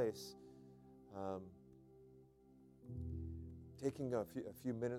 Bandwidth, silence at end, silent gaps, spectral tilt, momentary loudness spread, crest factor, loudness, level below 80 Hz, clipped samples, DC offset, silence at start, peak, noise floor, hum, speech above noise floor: 16 kHz; 0 s; none; -7 dB/octave; 22 LU; 20 dB; -47 LUFS; -62 dBFS; under 0.1%; under 0.1%; 0 s; -26 dBFS; -66 dBFS; none; 22 dB